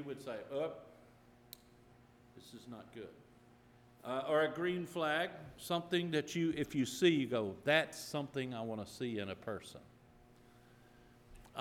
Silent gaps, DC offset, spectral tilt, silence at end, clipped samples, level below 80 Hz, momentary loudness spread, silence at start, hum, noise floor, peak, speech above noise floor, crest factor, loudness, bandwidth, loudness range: none; under 0.1%; -5 dB/octave; 0 s; under 0.1%; -70 dBFS; 22 LU; 0 s; none; -64 dBFS; -14 dBFS; 26 dB; 24 dB; -37 LUFS; 17.5 kHz; 14 LU